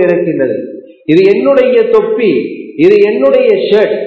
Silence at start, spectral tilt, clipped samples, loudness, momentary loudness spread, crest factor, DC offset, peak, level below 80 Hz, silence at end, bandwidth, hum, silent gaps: 0 s; -8 dB/octave; 1%; -9 LUFS; 10 LU; 8 dB; under 0.1%; 0 dBFS; -54 dBFS; 0 s; 6.2 kHz; none; none